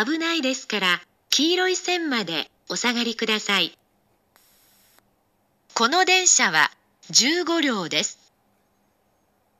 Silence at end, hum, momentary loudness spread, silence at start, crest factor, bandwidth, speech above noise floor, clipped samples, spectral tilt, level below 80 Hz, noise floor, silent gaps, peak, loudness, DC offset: 1.45 s; none; 10 LU; 0 s; 22 dB; 15 kHz; 45 dB; under 0.1%; -1 dB/octave; -76 dBFS; -67 dBFS; none; -2 dBFS; -21 LUFS; under 0.1%